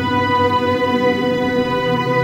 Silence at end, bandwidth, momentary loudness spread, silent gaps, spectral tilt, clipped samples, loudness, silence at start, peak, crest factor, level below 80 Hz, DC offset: 0 s; 16 kHz; 2 LU; none; -6.5 dB/octave; under 0.1%; -17 LUFS; 0 s; -4 dBFS; 12 dB; -46 dBFS; under 0.1%